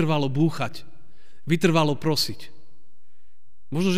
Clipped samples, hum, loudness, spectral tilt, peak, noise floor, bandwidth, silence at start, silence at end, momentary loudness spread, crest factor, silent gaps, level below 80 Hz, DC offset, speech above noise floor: under 0.1%; none; -24 LUFS; -5.5 dB/octave; -6 dBFS; -68 dBFS; 15.5 kHz; 0 s; 0 s; 19 LU; 18 dB; none; -60 dBFS; 3%; 45 dB